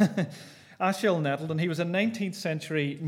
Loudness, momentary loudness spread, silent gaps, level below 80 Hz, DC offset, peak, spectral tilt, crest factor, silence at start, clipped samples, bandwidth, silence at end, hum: -29 LUFS; 8 LU; none; -78 dBFS; under 0.1%; -10 dBFS; -6 dB/octave; 18 dB; 0 s; under 0.1%; 16 kHz; 0 s; none